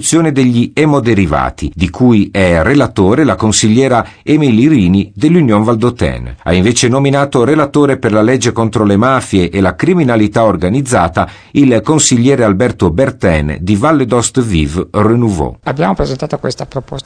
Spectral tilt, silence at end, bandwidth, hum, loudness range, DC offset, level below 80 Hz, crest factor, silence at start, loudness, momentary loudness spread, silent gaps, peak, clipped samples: -5.5 dB/octave; 0.05 s; 10.5 kHz; none; 2 LU; under 0.1%; -30 dBFS; 10 dB; 0 s; -11 LUFS; 7 LU; none; 0 dBFS; under 0.1%